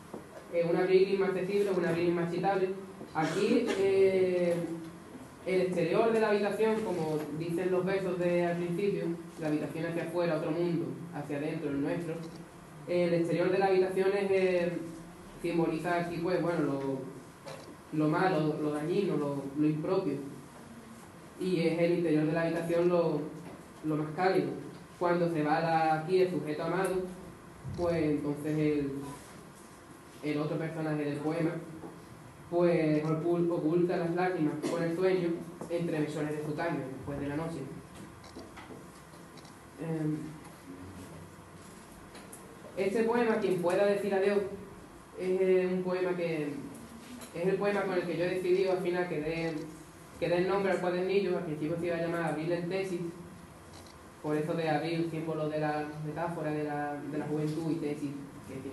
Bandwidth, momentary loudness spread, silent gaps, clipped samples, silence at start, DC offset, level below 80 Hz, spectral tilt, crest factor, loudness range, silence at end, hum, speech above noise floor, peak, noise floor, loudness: 12.5 kHz; 20 LU; none; under 0.1%; 0 s; under 0.1%; -64 dBFS; -7 dB/octave; 18 dB; 6 LU; 0 s; none; 21 dB; -12 dBFS; -51 dBFS; -31 LUFS